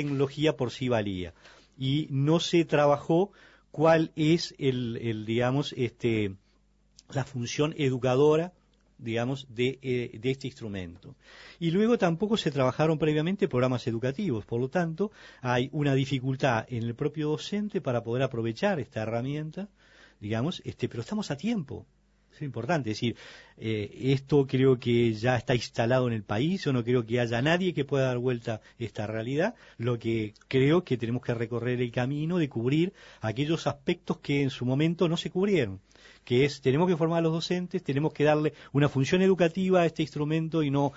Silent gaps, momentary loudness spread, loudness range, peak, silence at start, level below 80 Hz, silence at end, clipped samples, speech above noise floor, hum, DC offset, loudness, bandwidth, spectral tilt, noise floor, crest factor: none; 10 LU; 6 LU; -10 dBFS; 0 s; -60 dBFS; 0 s; under 0.1%; 38 dB; none; under 0.1%; -28 LUFS; 8 kHz; -6.5 dB/octave; -65 dBFS; 18 dB